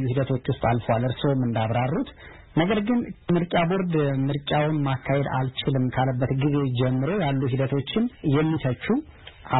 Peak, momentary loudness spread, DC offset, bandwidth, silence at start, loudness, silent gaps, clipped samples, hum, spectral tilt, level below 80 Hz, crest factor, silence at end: -8 dBFS; 4 LU; 0.2%; 4.1 kHz; 0 s; -24 LUFS; none; under 0.1%; none; -12 dB/octave; -48 dBFS; 16 dB; 0 s